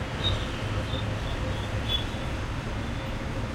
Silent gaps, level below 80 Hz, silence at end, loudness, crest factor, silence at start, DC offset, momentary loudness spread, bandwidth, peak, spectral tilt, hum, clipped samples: none; -36 dBFS; 0 s; -31 LUFS; 14 dB; 0 s; under 0.1%; 5 LU; 16 kHz; -14 dBFS; -5.5 dB/octave; none; under 0.1%